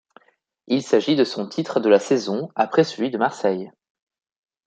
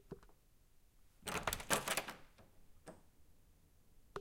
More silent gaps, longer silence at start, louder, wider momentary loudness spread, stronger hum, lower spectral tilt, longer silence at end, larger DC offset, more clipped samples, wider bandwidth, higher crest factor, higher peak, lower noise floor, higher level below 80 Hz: neither; first, 0.7 s vs 0.05 s; first, -21 LUFS vs -40 LUFS; second, 8 LU vs 24 LU; neither; first, -5.5 dB/octave vs -2 dB/octave; first, 0.95 s vs 0 s; neither; neither; second, 9 kHz vs 17 kHz; second, 20 dB vs 32 dB; first, -2 dBFS vs -16 dBFS; second, -62 dBFS vs -68 dBFS; second, -72 dBFS vs -62 dBFS